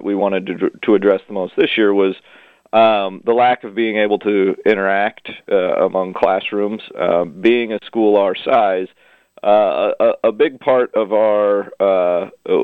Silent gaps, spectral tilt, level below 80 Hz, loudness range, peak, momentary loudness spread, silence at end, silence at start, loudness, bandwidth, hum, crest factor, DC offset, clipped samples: none; -7.5 dB/octave; -62 dBFS; 2 LU; 0 dBFS; 7 LU; 0 s; 0 s; -16 LUFS; 4.9 kHz; none; 16 dB; under 0.1%; under 0.1%